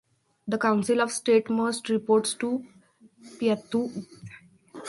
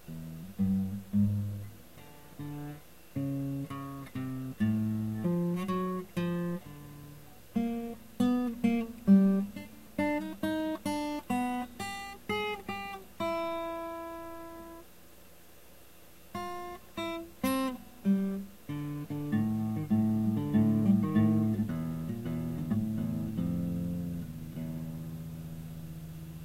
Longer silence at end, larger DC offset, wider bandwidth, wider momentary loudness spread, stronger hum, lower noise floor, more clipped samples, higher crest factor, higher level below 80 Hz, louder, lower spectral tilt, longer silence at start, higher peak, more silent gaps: about the same, 0 s vs 0 s; second, under 0.1% vs 0.2%; second, 11.5 kHz vs 16 kHz; about the same, 18 LU vs 16 LU; neither; second, -49 dBFS vs -57 dBFS; neither; about the same, 18 dB vs 20 dB; second, -72 dBFS vs -58 dBFS; first, -26 LUFS vs -33 LUFS; second, -4.5 dB/octave vs -7.5 dB/octave; first, 0.45 s vs 0.05 s; about the same, -10 dBFS vs -12 dBFS; neither